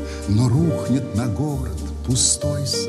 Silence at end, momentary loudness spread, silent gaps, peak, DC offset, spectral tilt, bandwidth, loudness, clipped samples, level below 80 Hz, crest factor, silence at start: 0 s; 9 LU; none; -6 dBFS; under 0.1%; -5 dB/octave; 13.5 kHz; -20 LUFS; under 0.1%; -34 dBFS; 14 dB; 0 s